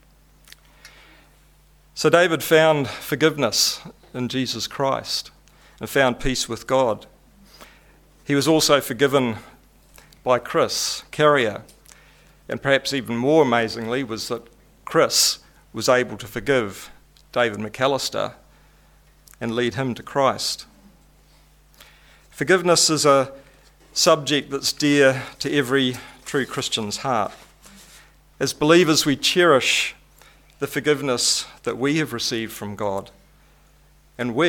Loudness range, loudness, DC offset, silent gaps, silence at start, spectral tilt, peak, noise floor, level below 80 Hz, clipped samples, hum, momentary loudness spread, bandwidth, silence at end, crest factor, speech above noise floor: 6 LU; -20 LUFS; under 0.1%; none; 0.85 s; -3.5 dB/octave; 0 dBFS; -54 dBFS; -50 dBFS; under 0.1%; none; 14 LU; 18.5 kHz; 0 s; 22 dB; 34 dB